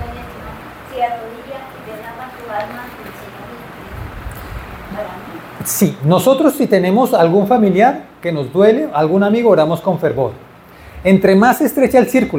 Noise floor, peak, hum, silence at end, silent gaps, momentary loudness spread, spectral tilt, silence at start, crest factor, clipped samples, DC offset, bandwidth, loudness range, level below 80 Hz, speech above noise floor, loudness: -39 dBFS; 0 dBFS; none; 0 s; none; 20 LU; -6 dB/octave; 0 s; 16 dB; under 0.1%; under 0.1%; 17 kHz; 16 LU; -42 dBFS; 25 dB; -14 LUFS